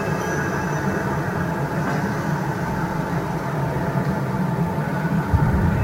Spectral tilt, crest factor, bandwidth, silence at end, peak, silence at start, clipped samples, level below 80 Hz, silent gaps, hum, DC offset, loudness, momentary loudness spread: -7 dB/octave; 18 dB; 16 kHz; 0 s; -4 dBFS; 0 s; under 0.1%; -36 dBFS; none; none; under 0.1%; -23 LUFS; 4 LU